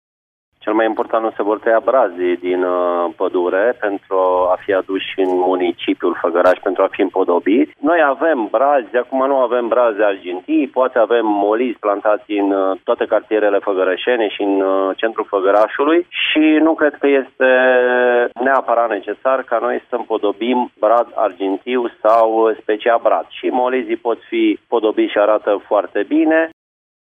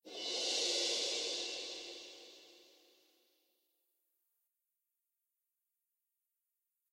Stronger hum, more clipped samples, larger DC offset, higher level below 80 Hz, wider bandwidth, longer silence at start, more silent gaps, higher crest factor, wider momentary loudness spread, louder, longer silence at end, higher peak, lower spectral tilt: neither; neither; neither; first, -64 dBFS vs under -90 dBFS; second, 4.8 kHz vs 16 kHz; first, 0.65 s vs 0.05 s; neither; second, 14 dB vs 20 dB; second, 5 LU vs 21 LU; first, -16 LUFS vs -36 LUFS; second, 0.5 s vs 4.3 s; first, 0 dBFS vs -24 dBFS; first, -6 dB/octave vs 1.5 dB/octave